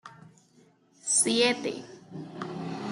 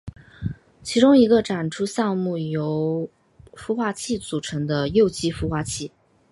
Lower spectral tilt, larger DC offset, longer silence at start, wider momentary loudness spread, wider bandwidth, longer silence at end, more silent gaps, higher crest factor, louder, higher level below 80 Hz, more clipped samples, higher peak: second, -2 dB/octave vs -5.5 dB/octave; neither; about the same, 0.05 s vs 0.05 s; first, 20 LU vs 17 LU; about the same, 12.5 kHz vs 11.5 kHz; second, 0 s vs 0.45 s; neither; about the same, 20 dB vs 20 dB; second, -26 LUFS vs -22 LUFS; second, -76 dBFS vs -46 dBFS; neither; second, -10 dBFS vs -4 dBFS